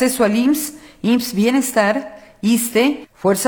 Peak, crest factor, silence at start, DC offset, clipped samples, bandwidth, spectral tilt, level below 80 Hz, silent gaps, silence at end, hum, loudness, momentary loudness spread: -2 dBFS; 14 dB; 0 s; under 0.1%; under 0.1%; 19 kHz; -4 dB/octave; -56 dBFS; none; 0 s; none; -17 LUFS; 9 LU